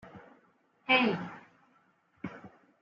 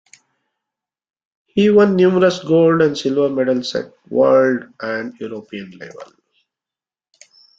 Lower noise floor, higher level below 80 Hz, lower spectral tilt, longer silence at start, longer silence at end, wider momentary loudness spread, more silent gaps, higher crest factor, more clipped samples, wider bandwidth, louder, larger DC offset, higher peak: second, -69 dBFS vs -90 dBFS; second, -76 dBFS vs -60 dBFS; second, -2 dB/octave vs -6.5 dB/octave; second, 0.05 s vs 1.55 s; second, 0.35 s vs 1.55 s; first, 26 LU vs 18 LU; neither; first, 24 dB vs 16 dB; neither; about the same, 7.2 kHz vs 7.8 kHz; second, -28 LUFS vs -16 LUFS; neither; second, -12 dBFS vs -2 dBFS